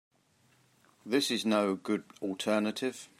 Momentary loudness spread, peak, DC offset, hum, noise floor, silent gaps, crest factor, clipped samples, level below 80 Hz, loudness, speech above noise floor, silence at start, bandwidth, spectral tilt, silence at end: 8 LU; -14 dBFS; under 0.1%; none; -68 dBFS; none; 18 dB; under 0.1%; -84 dBFS; -31 LUFS; 37 dB; 1.05 s; 16 kHz; -4 dB/octave; 0.15 s